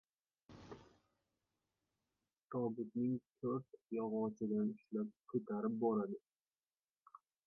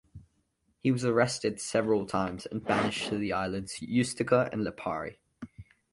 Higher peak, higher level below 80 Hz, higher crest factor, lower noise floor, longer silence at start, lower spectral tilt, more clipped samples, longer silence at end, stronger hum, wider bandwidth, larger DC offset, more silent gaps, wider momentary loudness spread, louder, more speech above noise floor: second, -24 dBFS vs -10 dBFS; second, -82 dBFS vs -58 dBFS; about the same, 18 dB vs 20 dB; first, under -90 dBFS vs -74 dBFS; first, 0.5 s vs 0.15 s; first, -10 dB/octave vs -5 dB/octave; neither; first, 1.3 s vs 0.3 s; neither; second, 6.2 kHz vs 11.5 kHz; neither; first, 2.44-2.48 s vs none; first, 17 LU vs 11 LU; second, -42 LUFS vs -30 LUFS; first, over 49 dB vs 44 dB